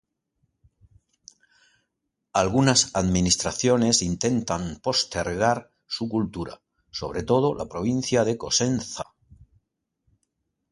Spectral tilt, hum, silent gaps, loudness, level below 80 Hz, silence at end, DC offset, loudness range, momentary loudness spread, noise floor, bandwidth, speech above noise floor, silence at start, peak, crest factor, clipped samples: -4 dB/octave; none; none; -24 LUFS; -48 dBFS; 1.7 s; under 0.1%; 5 LU; 14 LU; -80 dBFS; 11.5 kHz; 56 dB; 2.35 s; -4 dBFS; 22 dB; under 0.1%